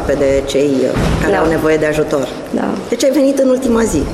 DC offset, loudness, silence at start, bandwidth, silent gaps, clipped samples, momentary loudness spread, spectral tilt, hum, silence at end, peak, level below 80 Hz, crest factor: under 0.1%; -14 LUFS; 0 s; 15 kHz; none; under 0.1%; 6 LU; -5.5 dB/octave; none; 0 s; -4 dBFS; -28 dBFS; 10 dB